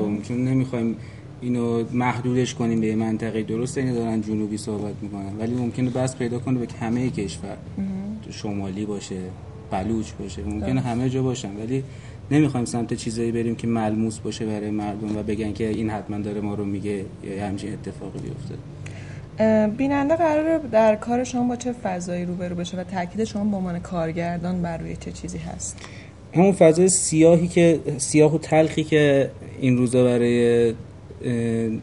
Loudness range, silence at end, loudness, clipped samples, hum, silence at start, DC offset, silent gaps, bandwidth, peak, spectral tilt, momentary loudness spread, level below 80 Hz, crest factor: 10 LU; 0 s; -23 LUFS; under 0.1%; none; 0 s; 0.1%; none; 11.5 kHz; -2 dBFS; -6 dB/octave; 15 LU; -46 dBFS; 20 dB